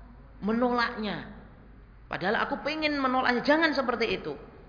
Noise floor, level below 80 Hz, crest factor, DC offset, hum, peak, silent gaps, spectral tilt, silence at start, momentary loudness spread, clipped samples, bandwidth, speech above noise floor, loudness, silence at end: -51 dBFS; -52 dBFS; 18 dB; under 0.1%; none; -10 dBFS; none; -5.5 dB/octave; 0 s; 13 LU; under 0.1%; 5.2 kHz; 23 dB; -27 LUFS; 0 s